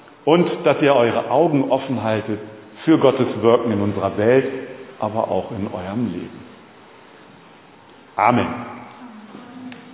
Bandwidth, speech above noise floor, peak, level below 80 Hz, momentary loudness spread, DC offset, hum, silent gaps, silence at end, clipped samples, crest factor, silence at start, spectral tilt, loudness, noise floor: 4 kHz; 28 dB; 0 dBFS; -54 dBFS; 22 LU; under 0.1%; none; none; 0 s; under 0.1%; 20 dB; 0.25 s; -11 dB/octave; -19 LUFS; -46 dBFS